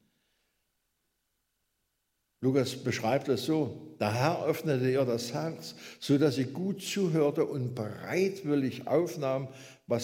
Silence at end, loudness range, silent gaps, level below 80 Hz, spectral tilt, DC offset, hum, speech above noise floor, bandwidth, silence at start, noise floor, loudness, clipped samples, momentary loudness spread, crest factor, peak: 0 s; 3 LU; none; -74 dBFS; -6 dB/octave; under 0.1%; none; 50 dB; 16 kHz; 2.4 s; -80 dBFS; -30 LUFS; under 0.1%; 9 LU; 20 dB; -12 dBFS